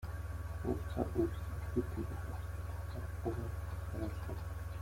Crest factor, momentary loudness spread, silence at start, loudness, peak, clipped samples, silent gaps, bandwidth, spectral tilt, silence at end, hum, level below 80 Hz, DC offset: 20 dB; 6 LU; 0 s; -41 LUFS; -18 dBFS; under 0.1%; none; 16.5 kHz; -8 dB/octave; 0 s; none; -46 dBFS; under 0.1%